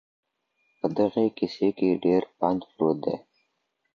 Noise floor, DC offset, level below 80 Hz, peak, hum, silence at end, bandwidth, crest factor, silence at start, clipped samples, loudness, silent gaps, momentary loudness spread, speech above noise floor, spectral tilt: -76 dBFS; under 0.1%; -64 dBFS; -8 dBFS; none; 0.75 s; 7 kHz; 18 dB; 0.85 s; under 0.1%; -26 LUFS; none; 7 LU; 51 dB; -8.5 dB/octave